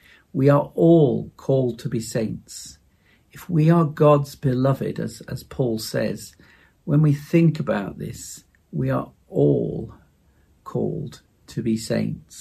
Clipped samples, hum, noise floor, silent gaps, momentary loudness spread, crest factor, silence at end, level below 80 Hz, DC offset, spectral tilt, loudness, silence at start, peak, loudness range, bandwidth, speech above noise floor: under 0.1%; none; -59 dBFS; none; 18 LU; 18 dB; 0 s; -52 dBFS; under 0.1%; -7.5 dB/octave; -22 LUFS; 0.35 s; -4 dBFS; 5 LU; 14.5 kHz; 38 dB